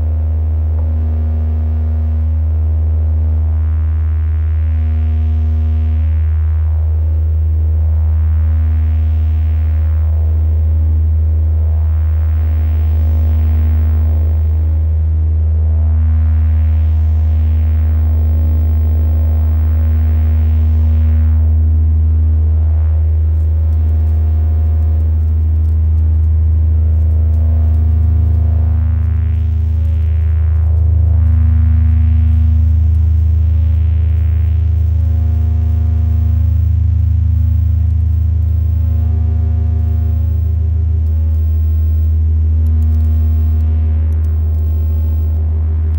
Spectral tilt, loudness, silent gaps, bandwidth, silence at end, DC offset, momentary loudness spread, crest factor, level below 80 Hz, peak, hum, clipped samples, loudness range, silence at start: -11 dB/octave; -14 LUFS; none; 2.3 kHz; 0 s; under 0.1%; 3 LU; 8 dB; -14 dBFS; -4 dBFS; 50 Hz at -40 dBFS; under 0.1%; 2 LU; 0 s